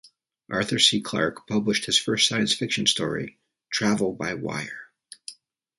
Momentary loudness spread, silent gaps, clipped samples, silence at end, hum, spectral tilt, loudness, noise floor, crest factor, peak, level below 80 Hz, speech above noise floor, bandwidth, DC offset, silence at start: 20 LU; none; under 0.1%; 0.45 s; none; -3 dB/octave; -23 LUFS; -46 dBFS; 22 dB; -4 dBFS; -62 dBFS; 21 dB; 11.5 kHz; under 0.1%; 0.5 s